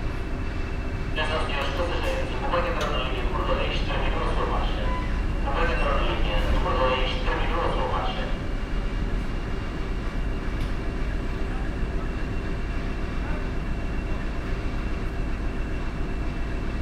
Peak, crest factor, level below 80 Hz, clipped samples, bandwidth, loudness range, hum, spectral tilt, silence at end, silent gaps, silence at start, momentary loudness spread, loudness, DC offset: -10 dBFS; 14 dB; -28 dBFS; under 0.1%; 9.8 kHz; 5 LU; none; -6 dB/octave; 0 s; none; 0 s; 6 LU; -28 LUFS; under 0.1%